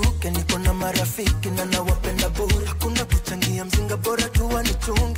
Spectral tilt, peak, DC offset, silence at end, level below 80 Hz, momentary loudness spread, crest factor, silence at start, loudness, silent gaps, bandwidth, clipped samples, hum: -4.5 dB/octave; -4 dBFS; under 0.1%; 0 s; -26 dBFS; 2 LU; 16 dB; 0 s; -23 LUFS; none; 16.5 kHz; under 0.1%; none